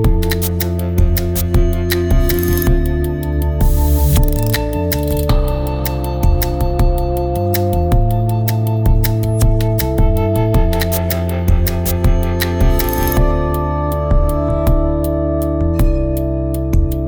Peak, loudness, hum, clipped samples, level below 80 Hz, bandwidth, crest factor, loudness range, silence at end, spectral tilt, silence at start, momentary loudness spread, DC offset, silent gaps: -2 dBFS; -16 LUFS; none; under 0.1%; -16 dBFS; over 20 kHz; 12 dB; 1 LU; 0 s; -6.5 dB/octave; 0 s; 3 LU; under 0.1%; none